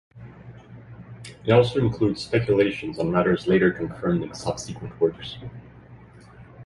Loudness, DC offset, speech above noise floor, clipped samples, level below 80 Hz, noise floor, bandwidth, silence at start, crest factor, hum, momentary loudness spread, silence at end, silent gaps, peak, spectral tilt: -23 LUFS; under 0.1%; 24 dB; under 0.1%; -50 dBFS; -47 dBFS; 11.5 kHz; 0.15 s; 22 dB; none; 24 LU; 0 s; none; -4 dBFS; -6.5 dB/octave